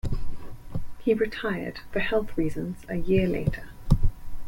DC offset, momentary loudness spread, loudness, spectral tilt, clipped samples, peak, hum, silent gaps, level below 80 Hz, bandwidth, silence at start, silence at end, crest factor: under 0.1%; 14 LU; -28 LUFS; -7.5 dB/octave; under 0.1%; -6 dBFS; none; none; -32 dBFS; 15.5 kHz; 0.05 s; 0 s; 18 dB